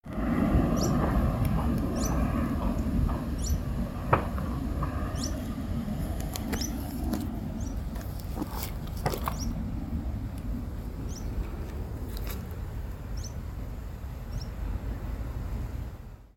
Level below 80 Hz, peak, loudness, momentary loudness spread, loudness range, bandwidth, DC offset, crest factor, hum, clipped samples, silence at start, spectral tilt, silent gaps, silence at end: -34 dBFS; -8 dBFS; -32 LUFS; 11 LU; 9 LU; 17 kHz; under 0.1%; 24 dB; none; under 0.1%; 0.05 s; -6.5 dB/octave; none; 0.1 s